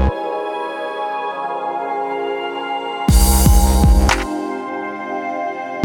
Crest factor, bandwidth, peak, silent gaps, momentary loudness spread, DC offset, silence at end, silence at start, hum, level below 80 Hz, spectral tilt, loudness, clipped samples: 16 dB; 19 kHz; 0 dBFS; none; 11 LU; under 0.1%; 0 s; 0 s; none; -20 dBFS; -5 dB/octave; -18 LUFS; under 0.1%